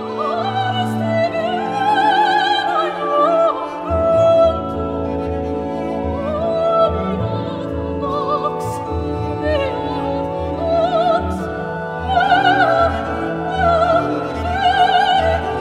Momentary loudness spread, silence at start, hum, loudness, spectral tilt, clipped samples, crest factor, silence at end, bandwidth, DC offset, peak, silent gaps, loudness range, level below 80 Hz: 9 LU; 0 s; none; -17 LUFS; -6 dB/octave; under 0.1%; 16 dB; 0 s; 12.5 kHz; under 0.1%; -2 dBFS; none; 5 LU; -38 dBFS